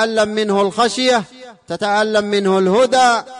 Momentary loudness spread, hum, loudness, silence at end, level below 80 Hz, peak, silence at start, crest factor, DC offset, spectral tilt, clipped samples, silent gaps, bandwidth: 7 LU; none; -15 LUFS; 0 s; -56 dBFS; -4 dBFS; 0 s; 12 dB; under 0.1%; -4 dB/octave; under 0.1%; none; 11.5 kHz